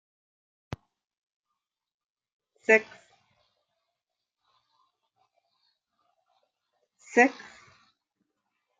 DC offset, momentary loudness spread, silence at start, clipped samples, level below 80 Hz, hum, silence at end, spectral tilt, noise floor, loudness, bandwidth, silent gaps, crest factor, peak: under 0.1%; 22 LU; 2.7 s; under 0.1%; -72 dBFS; none; 1.5 s; -4.5 dB/octave; -87 dBFS; -24 LUFS; 9 kHz; none; 28 dB; -6 dBFS